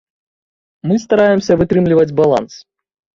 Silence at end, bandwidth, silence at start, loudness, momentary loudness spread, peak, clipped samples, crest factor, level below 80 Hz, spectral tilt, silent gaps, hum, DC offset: 0.55 s; 7.6 kHz; 0.85 s; -13 LUFS; 7 LU; -2 dBFS; under 0.1%; 14 dB; -46 dBFS; -7 dB/octave; none; none; under 0.1%